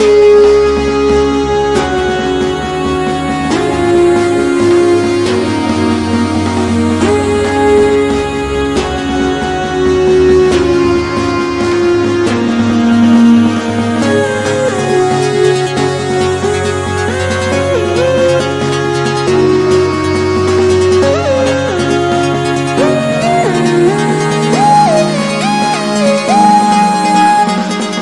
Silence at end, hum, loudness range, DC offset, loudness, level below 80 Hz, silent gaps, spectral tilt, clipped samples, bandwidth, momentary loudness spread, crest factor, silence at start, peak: 0 s; none; 2 LU; 0.3%; -11 LUFS; -34 dBFS; none; -5.5 dB/octave; under 0.1%; 11.5 kHz; 6 LU; 10 dB; 0 s; 0 dBFS